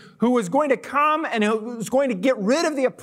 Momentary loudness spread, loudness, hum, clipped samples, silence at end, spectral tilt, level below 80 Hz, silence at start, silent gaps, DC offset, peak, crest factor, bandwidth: 3 LU; -21 LUFS; none; under 0.1%; 0 s; -5 dB/octave; -70 dBFS; 0.05 s; none; under 0.1%; -6 dBFS; 16 dB; 15.5 kHz